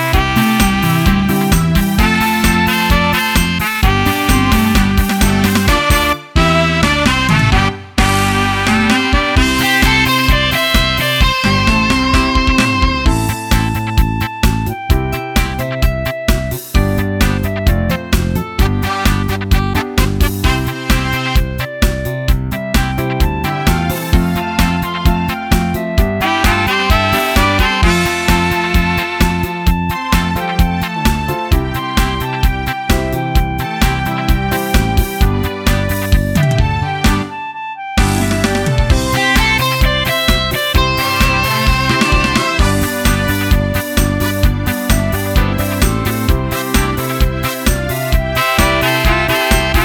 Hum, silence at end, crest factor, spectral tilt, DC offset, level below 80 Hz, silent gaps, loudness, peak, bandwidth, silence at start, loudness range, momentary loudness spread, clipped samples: none; 0 s; 12 dB; -4.5 dB/octave; under 0.1%; -18 dBFS; none; -14 LUFS; 0 dBFS; 19.5 kHz; 0 s; 4 LU; 5 LU; under 0.1%